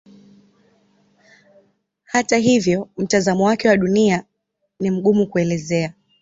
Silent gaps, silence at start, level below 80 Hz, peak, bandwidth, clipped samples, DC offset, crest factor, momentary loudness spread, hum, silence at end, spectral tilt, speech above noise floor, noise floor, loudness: none; 2.15 s; -56 dBFS; -2 dBFS; 8 kHz; under 0.1%; under 0.1%; 18 dB; 7 LU; none; 0.3 s; -5.5 dB/octave; 56 dB; -73 dBFS; -18 LUFS